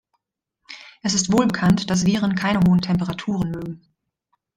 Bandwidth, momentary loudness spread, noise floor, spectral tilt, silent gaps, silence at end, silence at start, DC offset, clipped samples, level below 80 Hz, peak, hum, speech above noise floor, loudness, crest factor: 11 kHz; 20 LU; -77 dBFS; -5 dB/octave; none; 0.8 s; 0.7 s; under 0.1%; under 0.1%; -48 dBFS; -4 dBFS; none; 58 dB; -20 LUFS; 18 dB